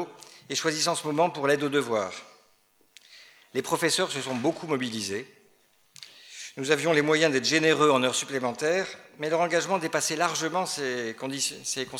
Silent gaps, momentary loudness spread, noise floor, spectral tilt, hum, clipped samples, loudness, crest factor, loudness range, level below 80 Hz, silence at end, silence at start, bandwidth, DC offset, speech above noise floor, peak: none; 14 LU; -64 dBFS; -3 dB/octave; none; under 0.1%; -26 LUFS; 22 dB; 6 LU; -78 dBFS; 0 s; 0 s; 16.5 kHz; under 0.1%; 38 dB; -6 dBFS